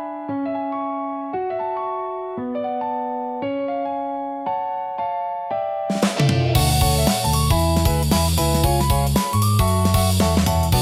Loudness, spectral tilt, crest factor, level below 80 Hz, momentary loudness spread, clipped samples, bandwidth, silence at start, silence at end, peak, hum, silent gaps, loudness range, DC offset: -21 LUFS; -5 dB/octave; 16 dB; -30 dBFS; 9 LU; under 0.1%; 16.5 kHz; 0 s; 0 s; -4 dBFS; none; none; 7 LU; under 0.1%